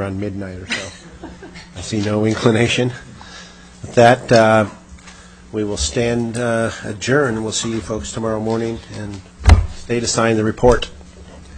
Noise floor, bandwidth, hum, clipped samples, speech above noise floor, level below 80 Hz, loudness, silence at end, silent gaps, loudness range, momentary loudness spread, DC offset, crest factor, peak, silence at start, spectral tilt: -40 dBFS; 10.5 kHz; none; under 0.1%; 23 dB; -28 dBFS; -17 LUFS; 0 s; none; 5 LU; 22 LU; under 0.1%; 18 dB; 0 dBFS; 0 s; -5 dB/octave